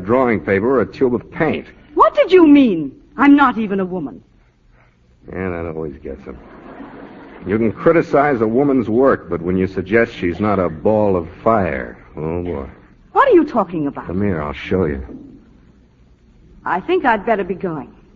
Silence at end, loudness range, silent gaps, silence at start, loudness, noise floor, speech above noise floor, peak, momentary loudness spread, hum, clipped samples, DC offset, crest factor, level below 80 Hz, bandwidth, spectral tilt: 0.25 s; 10 LU; none; 0 s; -16 LUFS; -52 dBFS; 36 dB; 0 dBFS; 19 LU; none; under 0.1%; under 0.1%; 18 dB; -42 dBFS; 6.8 kHz; -8.5 dB/octave